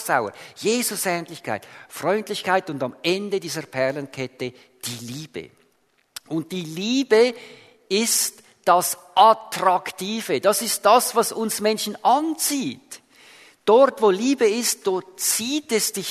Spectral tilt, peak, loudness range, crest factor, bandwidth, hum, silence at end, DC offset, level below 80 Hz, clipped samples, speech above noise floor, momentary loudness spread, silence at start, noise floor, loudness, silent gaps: -3 dB/octave; -2 dBFS; 8 LU; 20 dB; 13.5 kHz; none; 0 s; under 0.1%; -72 dBFS; under 0.1%; 43 dB; 16 LU; 0 s; -65 dBFS; -21 LUFS; none